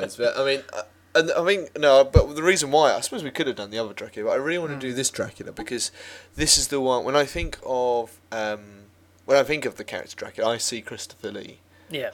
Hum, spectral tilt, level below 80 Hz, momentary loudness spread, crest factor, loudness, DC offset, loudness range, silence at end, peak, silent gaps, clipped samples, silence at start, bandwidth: none; -3.5 dB/octave; -40 dBFS; 17 LU; 24 dB; -23 LUFS; under 0.1%; 6 LU; 0 s; 0 dBFS; none; under 0.1%; 0 s; 17.5 kHz